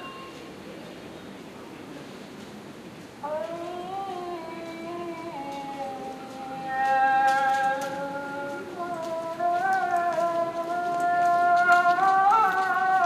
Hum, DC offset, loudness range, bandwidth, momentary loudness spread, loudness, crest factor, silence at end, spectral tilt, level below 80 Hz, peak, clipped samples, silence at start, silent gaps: none; under 0.1%; 15 LU; 14.5 kHz; 21 LU; -25 LUFS; 18 dB; 0 s; -4 dB/octave; -68 dBFS; -8 dBFS; under 0.1%; 0 s; none